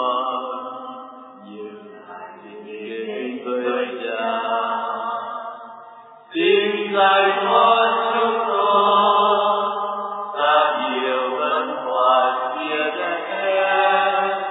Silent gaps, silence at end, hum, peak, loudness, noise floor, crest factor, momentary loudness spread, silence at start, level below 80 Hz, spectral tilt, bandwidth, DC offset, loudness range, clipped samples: none; 0 s; none; -2 dBFS; -19 LUFS; -43 dBFS; 18 dB; 21 LU; 0 s; -70 dBFS; -6.5 dB/octave; 4 kHz; under 0.1%; 12 LU; under 0.1%